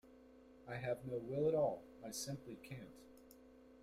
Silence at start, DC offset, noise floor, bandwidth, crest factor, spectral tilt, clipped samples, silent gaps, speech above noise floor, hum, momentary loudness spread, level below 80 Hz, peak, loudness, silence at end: 0.05 s; under 0.1%; -63 dBFS; 16 kHz; 18 dB; -5 dB/octave; under 0.1%; none; 21 dB; none; 26 LU; -72 dBFS; -26 dBFS; -43 LUFS; 0 s